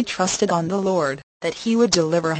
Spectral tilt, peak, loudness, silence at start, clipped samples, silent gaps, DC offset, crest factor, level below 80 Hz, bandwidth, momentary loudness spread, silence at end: -4 dB/octave; -4 dBFS; -21 LUFS; 0 s; under 0.1%; 1.23-1.40 s; under 0.1%; 16 dB; -56 dBFS; 8.8 kHz; 9 LU; 0 s